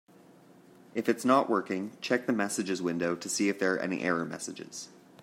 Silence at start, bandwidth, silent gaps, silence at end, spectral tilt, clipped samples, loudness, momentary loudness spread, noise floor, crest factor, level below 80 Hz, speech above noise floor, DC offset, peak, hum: 0.95 s; 16 kHz; none; 0.35 s; -4 dB/octave; under 0.1%; -30 LUFS; 13 LU; -57 dBFS; 22 dB; -76 dBFS; 27 dB; under 0.1%; -10 dBFS; none